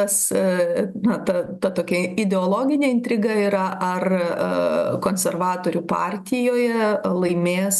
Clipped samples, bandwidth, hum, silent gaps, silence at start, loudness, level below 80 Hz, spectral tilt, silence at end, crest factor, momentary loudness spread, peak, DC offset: under 0.1%; 13 kHz; none; none; 0 s; -21 LUFS; -62 dBFS; -5 dB/octave; 0 s; 14 dB; 4 LU; -6 dBFS; under 0.1%